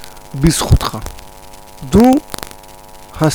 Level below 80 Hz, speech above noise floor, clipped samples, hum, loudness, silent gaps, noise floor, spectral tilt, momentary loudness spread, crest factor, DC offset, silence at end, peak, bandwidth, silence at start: -26 dBFS; 24 dB; under 0.1%; none; -13 LUFS; none; -36 dBFS; -5.5 dB/octave; 24 LU; 16 dB; under 0.1%; 0 s; 0 dBFS; over 20 kHz; 0 s